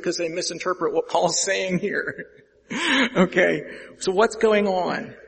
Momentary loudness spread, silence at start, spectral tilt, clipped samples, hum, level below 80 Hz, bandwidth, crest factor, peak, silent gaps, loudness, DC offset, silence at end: 10 LU; 0 s; -3.5 dB/octave; under 0.1%; none; -60 dBFS; 8.8 kHz; 20 dB; -2 dBFS; none; -22 LUFS; under 0.1%; 0.05 s